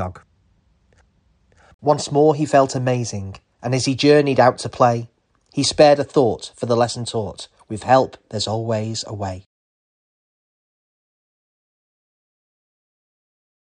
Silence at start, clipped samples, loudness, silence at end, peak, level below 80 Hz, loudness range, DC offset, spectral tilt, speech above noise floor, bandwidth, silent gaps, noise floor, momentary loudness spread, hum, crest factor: 0 s; under 0.1%; -18 LUFS; 4.25 s; -2 dBFS; -56 dBFS; 11 LU; under 0.1%; -5 dB/octave; 42 dB; 10.5 kHz; 1.74-1.79 s; -60 dBFS; 17 LU; none; 20 dB